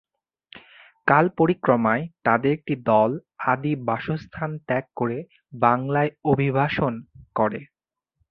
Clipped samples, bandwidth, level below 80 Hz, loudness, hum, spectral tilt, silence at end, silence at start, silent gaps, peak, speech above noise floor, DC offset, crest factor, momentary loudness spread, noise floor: under 0.1%; 5.6 kHz; -56 dBFS; -23 LUFS; none; -10 dB/octave; 0.65 s; 0.55 s; none; -2 dBFS; 52 dB; under 0.1%; 22 dB; 11 LU; -75 dBFS